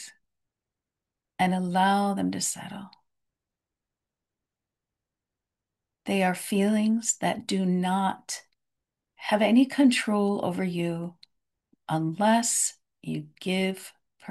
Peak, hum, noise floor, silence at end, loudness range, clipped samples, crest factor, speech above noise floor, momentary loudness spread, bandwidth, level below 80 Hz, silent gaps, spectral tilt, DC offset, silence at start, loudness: -10 dBFS; none; -88 dBFS; 0 s; 7 LU; under 0.1%; 18 dB; 63 dB; 18 LU; 12.5 kHz; -74 dBFS; none; -4.5 dB/octave; under 0.1%; 0 s; -26 LUFS